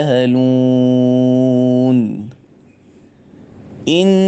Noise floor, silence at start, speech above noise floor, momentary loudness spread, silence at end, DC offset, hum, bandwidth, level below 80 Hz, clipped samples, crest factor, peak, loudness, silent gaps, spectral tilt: -45 dBFS; 0 s; 34 dB; 10 LU; 0 s; under 0.1%; none; 8.2 kHz; -58 dBFS; under 0.1%; 12 dB; 0 dBFS; -13 LUFS; none; -7.5 dB/octave